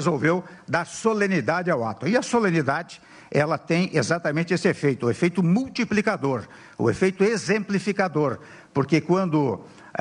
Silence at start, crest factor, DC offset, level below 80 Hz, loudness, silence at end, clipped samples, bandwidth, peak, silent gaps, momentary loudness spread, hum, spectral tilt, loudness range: 0 s; 16 dB; under 0.1%; -60 dBFS; -23 LUFS; 0 s; under 0.1%; 11 kHz; -6 dBFS; none; 7 LU; none; -6 dB/octave; 1 LU